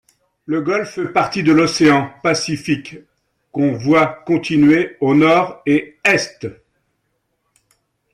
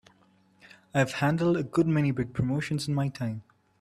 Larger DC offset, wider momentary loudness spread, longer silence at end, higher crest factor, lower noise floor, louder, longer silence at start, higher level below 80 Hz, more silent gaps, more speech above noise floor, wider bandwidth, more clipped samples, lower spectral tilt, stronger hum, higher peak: neither; first, 10 LU vs 7 LU; first, 1.6 s vs 0.4 s; about the same, 14 dB vs 18 dB; first, -69 dBFS vs -63 dBFS; first, -16 LUFS vs -28 LUFS; second, 0.5 s vs 0.95 s; about the same, -56 dBFS vs -56 dBFS; neither; first, 54 dB vs 36 dB; second, 11 kHz vs 13.5 kHz; neither; second, -5.5 dB/octave vs -7 dB/octave; neither; first, -2 dBFS vs -10 dBFS